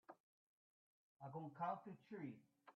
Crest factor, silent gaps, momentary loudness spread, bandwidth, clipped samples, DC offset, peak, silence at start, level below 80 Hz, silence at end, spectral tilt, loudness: 22 dB; 0.20-1.20 s; 18 LU; 6.2 kHz; under 0.1%; under 0.1%; -34 dBFS; 0.1 s; under -90 dBFS; 0.05 s; -7 dB/octave; -52 LUFS